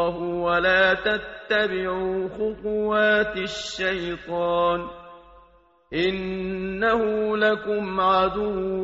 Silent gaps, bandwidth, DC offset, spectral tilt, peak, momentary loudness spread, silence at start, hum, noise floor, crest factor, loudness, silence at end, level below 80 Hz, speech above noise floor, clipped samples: none; 7.6 kHz; under 0.1%; -2.5 dB/octave; -8 dBFS; 9 LU; 0 s; none; -57 dBFS; 16 dB; -23 LUFS; 0 s; -50 dBFS; 33 dB; under 0.1%